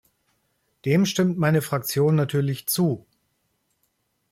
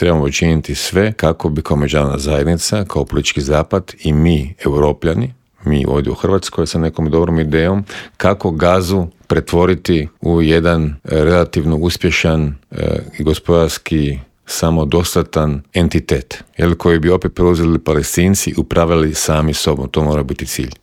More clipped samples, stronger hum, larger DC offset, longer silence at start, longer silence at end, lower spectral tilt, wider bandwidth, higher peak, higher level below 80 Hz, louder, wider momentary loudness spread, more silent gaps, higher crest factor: neither; neither; neither; first, 0.85 s vs 0 s; first, 1.35 s vs 0.1 s; about the same, -5.5 dB/octave vs -5.5 dB/octave; about the same, 16.5 kHz vs 16.5 kHz; second, -8 dBFS vs 0 dBFS; second, -62 dBFS vs -30 dBFS; second, -23 LUFS vs -15 LUFS; about the same, 5 LU vs 6 LU; neither; about the same, 16 dB vs 14 dB